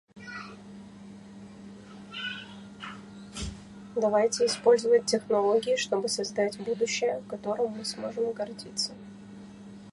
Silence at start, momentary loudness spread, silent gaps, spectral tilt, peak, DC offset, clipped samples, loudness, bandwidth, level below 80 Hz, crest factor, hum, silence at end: 0.15 s; 22 LU; none; -3 dB/octave; -8 dBFS; under 0.1%; under 0.1%; -28 LUFS; 11.5 kHz; -58 dBFS; 20 dB; 50 Hz at -45 dBFS; 0 s